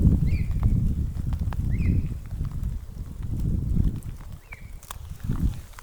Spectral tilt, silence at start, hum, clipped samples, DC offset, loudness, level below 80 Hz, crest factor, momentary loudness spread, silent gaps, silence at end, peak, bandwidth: -8 dB/octave; 0 s; none; under 0.1%; under 0.1%; -28 LUFS; -28 dBFS; 20 dB; 15 LU; none; 0 s; -6 dBFS; over 20 kHz